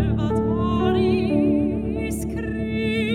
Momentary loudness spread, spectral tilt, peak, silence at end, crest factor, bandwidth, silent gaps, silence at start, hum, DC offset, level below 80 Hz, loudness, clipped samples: 7 LU; -7 dB/octave; -8 dBFS; 0 s; 12 dB; 14.5 kHz; none; 0 s; none; under 0.1%; -34 dBFS; -22 LUFS; under 0.1%